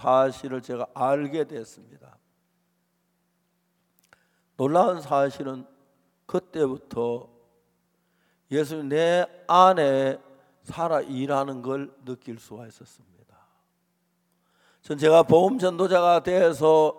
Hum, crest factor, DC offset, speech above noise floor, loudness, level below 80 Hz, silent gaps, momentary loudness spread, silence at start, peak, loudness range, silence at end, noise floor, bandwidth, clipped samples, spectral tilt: none; 22 dB; under 0.1%; 49 dB; -23 LUFS; -68 dBFS; none; 20 LU; 0 s; -4 dBFS; 11 LU; 0 s; -72 dBFS; 15.5 kHz; under 0.1%; -6 dB/octave